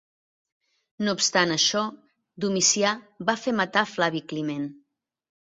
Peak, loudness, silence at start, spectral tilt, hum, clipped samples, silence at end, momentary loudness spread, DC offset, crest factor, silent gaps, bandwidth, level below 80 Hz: -4 dBFS; -24 LUFS; 1 s; -2.5 dB/octave; none; under 0.1%; 0.75 s; 11 LU; under 0.1%; 22 dB; none; 8.2 kHz; -70 dBFS